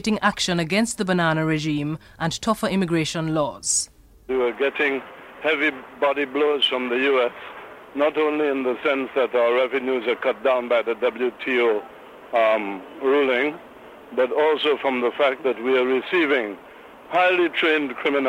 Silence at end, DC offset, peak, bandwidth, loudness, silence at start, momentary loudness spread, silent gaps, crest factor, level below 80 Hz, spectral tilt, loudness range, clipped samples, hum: 0 s; under 0.1%; -4 dBFS; 16 kHz; -22 LUFS; 0.05 s; 8 LU; none; 18 dB; -56 dBFS; -4 dB/octave; 2 LU; under 0.1%; none